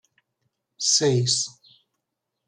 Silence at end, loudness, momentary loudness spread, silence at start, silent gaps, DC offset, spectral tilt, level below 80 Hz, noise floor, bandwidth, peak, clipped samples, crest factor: 0.95 s; -21 LUFS; 8 LU; 0.8 s; none; under 0.1%; -3 dB/octave; -68 dBFS; -81 dBFS; 12 kHz; -8 dBFS; under 0.1%; 18 dB